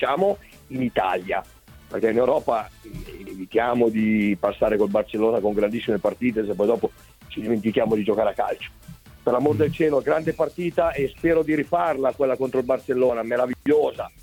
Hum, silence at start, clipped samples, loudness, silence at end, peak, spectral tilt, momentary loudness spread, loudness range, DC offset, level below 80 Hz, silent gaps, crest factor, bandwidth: none; 0 s; under 0.1%; -23 LUFS; 0.15 s; -6 dBFS; -7 dB/octave; 9 LU; 2 LU; under 0.1%; -50 dBFS; none; 16 dB; 18 kHz